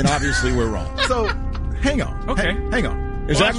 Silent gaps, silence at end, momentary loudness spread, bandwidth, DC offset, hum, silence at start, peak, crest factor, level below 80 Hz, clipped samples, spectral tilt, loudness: none; 0 s; 6 LU; 11.5 kHz; under 0.1%; none; 0 s; -4 dBFS; 16 dB; -26 dBFS; under 0.1%; -4.5 dB/octave; -21 LUFS